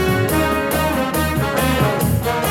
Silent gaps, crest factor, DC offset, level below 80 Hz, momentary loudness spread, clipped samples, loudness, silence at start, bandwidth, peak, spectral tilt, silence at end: none; 14 dB; under 0.1%; -30 dBFS; 2 LU; under 0.1%; -18 LUFS; 0 s; 18.5 kHz; -4 dBFS; -5 dB/octave; 0 s